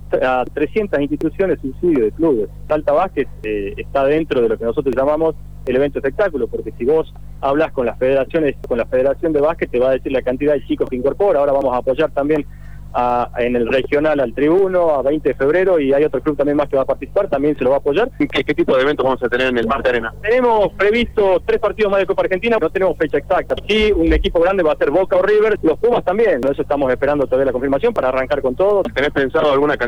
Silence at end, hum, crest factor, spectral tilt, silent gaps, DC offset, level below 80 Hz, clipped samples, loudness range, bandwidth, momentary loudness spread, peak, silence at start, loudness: 0 s; 50 Hz at -40 dBFS; 10 dB; -7 dB/octave; none; 2%; -34 dBFS; under 0.1%; 3 LU; 19.5 kHz; 5 LU; -4 dBFS; 0 s; -17 LUFS